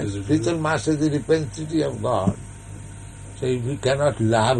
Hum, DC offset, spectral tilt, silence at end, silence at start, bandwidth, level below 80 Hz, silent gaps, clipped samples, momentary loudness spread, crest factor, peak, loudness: none; under 0.1%; -6 dB/octave; 0 s; 0 s; 10.5 kHz; -44 dBFS; none; under 0.1%; 18 LU; 18 dB; -6 dBFS; -23 LUFS